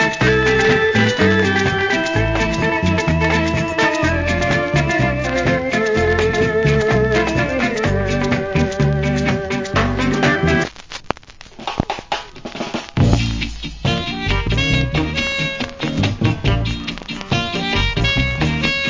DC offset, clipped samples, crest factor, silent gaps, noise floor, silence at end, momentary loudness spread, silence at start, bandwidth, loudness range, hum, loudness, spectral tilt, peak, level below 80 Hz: under 0.1%; under 0.1%; 18 dB; none; -39 dBFS; 0 s; 10 LU; 0 s; 7.6 kHz; 5 LU; none; -17 LUFS; -5.5 dB/octave; 0 dBFS; -28 dBFS